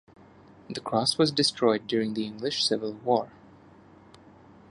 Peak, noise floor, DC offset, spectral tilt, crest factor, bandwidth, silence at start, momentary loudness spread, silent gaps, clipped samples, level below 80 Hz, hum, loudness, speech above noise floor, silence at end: -8 dBFS; -53 dBFS; under 0.1%; -4 dB/octave; 20 dB; 11.5 kHz; 0.7 s; 9 LU; none; under 0.1%; -68 dBFS; none; -26 LUFS; 27 dB; 1.4 s